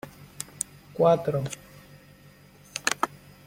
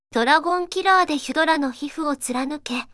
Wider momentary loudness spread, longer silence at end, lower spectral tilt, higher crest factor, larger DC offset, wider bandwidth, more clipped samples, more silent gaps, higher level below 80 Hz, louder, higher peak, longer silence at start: first, 18 LU vs 9 LU; first, 0.4 s vs 0.1 s; first, -4 dB/octave vs -2 dB/octave; first, 26 dB vs 18 dB; neither; first, 16.5 kHz vs 12 kHz; neither; neither; about the same, -62 dBFS vs -58 dBFS; second, -27 LUFS vs -21 LUFS; about the same, -4 dBFS vs -4 dBFS; about the same, 0.05 s vs 0.15 s